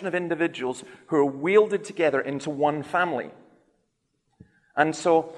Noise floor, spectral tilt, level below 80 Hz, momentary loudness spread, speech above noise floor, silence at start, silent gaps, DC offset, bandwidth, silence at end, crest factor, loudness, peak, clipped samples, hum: -74 dBFS; -5.5 dB/octave; -72 dBFS; 12 LU; 50 dB; 0 s; none; under 0.1%; 11 kHz; 0 s; 20 dB; -25 LUFS; -6 dBFS; under 0.1%; none